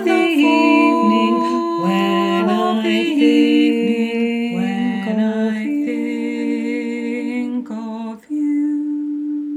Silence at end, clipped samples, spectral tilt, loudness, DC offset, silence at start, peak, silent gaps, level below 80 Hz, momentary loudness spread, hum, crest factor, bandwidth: 0 s; under 0.1%; -6 dB/octave; -17 LUFS; under 0.1%; 0 s; -2 dBFS; none; -68 dBFS; 10 LU; none; 16 dB; 13.5 kHz